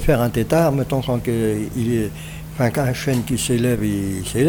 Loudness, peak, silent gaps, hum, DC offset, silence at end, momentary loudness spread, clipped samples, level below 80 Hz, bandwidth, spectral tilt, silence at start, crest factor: -20 LUFS; -2 dBFS; none; none; under 0.1%; 0 s; 6 LU; under 0.1%; -36 dBFS; over 20 kHz; -6 dB/octave; 0 s; 16 dB